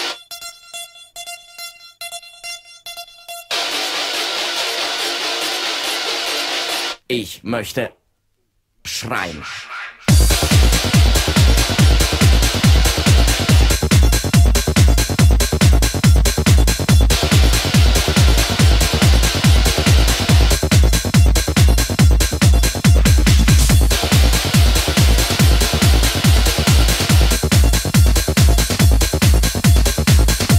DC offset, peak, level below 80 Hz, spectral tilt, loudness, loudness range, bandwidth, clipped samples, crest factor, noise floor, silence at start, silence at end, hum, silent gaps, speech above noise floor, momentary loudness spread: under 0.1%; 0 dBFS; -18 dBFS; -4 dB/octave; -14 LUFS; 9 LU; 16.5 kHz; under 0.1%; 14 dB; -66 dBFS; 0 s; 0 s; none; none; 42 dB; 16 LU